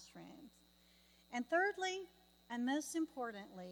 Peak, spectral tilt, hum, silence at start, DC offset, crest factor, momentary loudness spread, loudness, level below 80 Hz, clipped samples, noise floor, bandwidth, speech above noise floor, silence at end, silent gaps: -24 dBFS; -3 dB/octave; none; 0 s; under 0.1%; 20 dB; 21 LU; -41 LUFS; -80 dBFS; under 0.1%; -69 dBFS; 19.5 kHz; 29 dB; 0 s; none